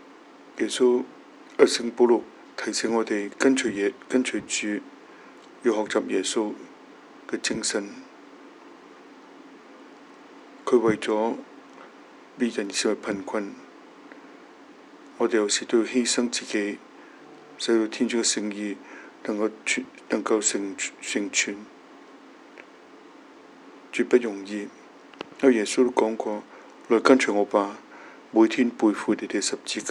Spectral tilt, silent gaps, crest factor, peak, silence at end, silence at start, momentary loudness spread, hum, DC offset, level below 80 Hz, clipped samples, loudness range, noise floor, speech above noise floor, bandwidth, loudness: -3 dB/octave; none; 26 dB; 0 dBFS; 0 s; 0.45 s; 19 LU; none; under 0.1%; -76 dBFS; under 0.1%; 8 LU; -49 dBFS; 25 dB; 12 kHz; -25 LUFS